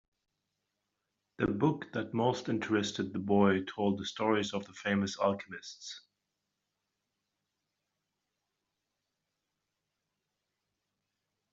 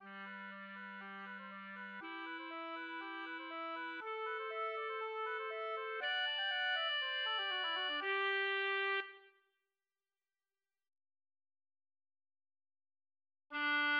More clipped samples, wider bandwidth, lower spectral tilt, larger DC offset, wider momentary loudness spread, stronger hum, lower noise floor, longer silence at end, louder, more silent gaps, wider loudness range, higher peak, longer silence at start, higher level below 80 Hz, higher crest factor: neither; first, 7.8 kHz vs 6.8 kHz; first, -5 dB/octave vs 2 dB/octave; neither; first, 16 LU vs 13 LU; neither; second, -86 dBFS vs under -90 dBFS; first, 5.55 s vs 0 s; first, -32 LUFS vs -39 LUFS; neither; about the same, 9 LU vs 10 LU; first, -12 dBFS vs -28 dBFS; first, 1.4 s vs 0 s; first, -68 dBFS vs under -90 dBFS; first, 22 dB vs 16 dB